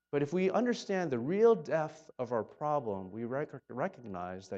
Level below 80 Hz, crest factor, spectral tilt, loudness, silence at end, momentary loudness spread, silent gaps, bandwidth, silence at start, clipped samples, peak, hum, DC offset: -78 dBFS; 18 dB; -6.5 dB/octave; -33 LUFS; 0 s; 14 LU; none; 7.8 kHz; 0.15 s; under 0.1%; -16 dBFS; none; under 0.1%